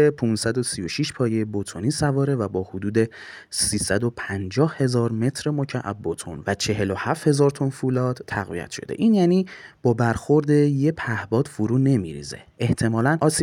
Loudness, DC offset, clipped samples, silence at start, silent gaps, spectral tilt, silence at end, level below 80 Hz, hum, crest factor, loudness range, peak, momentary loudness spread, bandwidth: -23 LUFS; under 0.1%; under 0.1%; 0 s; none; -5.5 dB/octave; 0 s; -52 dBFS; none; 16 dB; 3 LU; -6 dBFS; 10 LU; 17 kHz